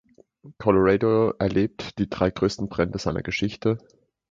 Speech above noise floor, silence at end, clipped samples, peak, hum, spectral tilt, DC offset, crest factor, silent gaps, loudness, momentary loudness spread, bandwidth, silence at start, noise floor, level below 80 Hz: 27 dB; 0.55 s; under 0.1%; -4 dBFS; none; -7 dB/octave; under 0.1%; 20 dB; none; -24 LUFS; 9 LU; 7.8 kHz; 0.45 s; -50 dBFS; -46 dBFS